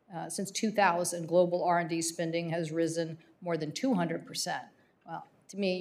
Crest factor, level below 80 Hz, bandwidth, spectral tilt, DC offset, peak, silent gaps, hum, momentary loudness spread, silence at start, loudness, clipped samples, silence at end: 20 dB; -84 dBFS; 15.5 kHz; -4.5 dB/octave; under 0.1%; -12 dBFS; none; none; 14 LU; 0.1 s; -31 LUFS; under 0.1%; 0 s